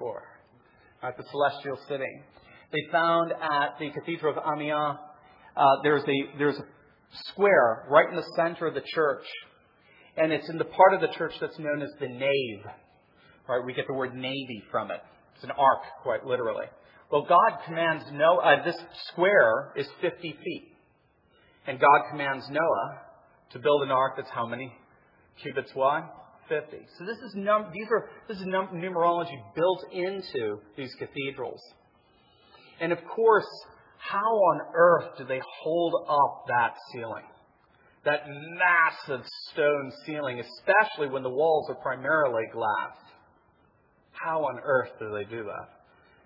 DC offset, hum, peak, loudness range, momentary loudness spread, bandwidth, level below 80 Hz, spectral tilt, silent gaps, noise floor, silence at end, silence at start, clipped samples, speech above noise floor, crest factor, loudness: under 0.1%; none; -4 dBFS; 7 LU; 17 LU; 5.8 kHz; -76 dBFS; -7.5 dB/octave; none; -65 dBFS; 0.6 s; 0 s; under 0.1%; 39 dB; 24 dB; -27 LUFS